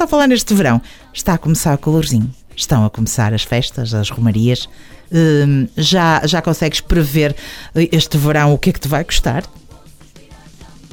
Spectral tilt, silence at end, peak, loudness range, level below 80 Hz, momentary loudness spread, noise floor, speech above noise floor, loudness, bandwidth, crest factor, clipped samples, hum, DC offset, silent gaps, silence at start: -5 dB/octave; 0.05 s; -2 dBFS; 3 LU; -28 dBFS; 8 LU; -40 dBFS; 26 dB; -15 LUFS; 19 kHz; 14 dB; under 0.1%; none; under 0.1%; none; 0 s